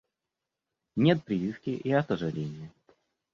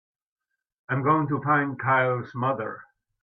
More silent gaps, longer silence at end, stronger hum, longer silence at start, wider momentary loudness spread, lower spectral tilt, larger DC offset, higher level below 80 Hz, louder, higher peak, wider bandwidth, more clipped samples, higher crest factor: neither; first, 0.65 s vs 0.4 s; neither; about the same, 0.95 s vs 0.9 s; first, 14 LU vs 9 LU; second, -8.5 dB/octave vs -10 dB/octave; neither; about the same, -64 dBFS vs -68 dBFS; second, -29 LUFS vs -25 LUFS; about the same, -8 dBFS vs -10 dBFS; first, 7.2 kHz vs 4.7 kHz; neither; first, 22 dB vs 16 dB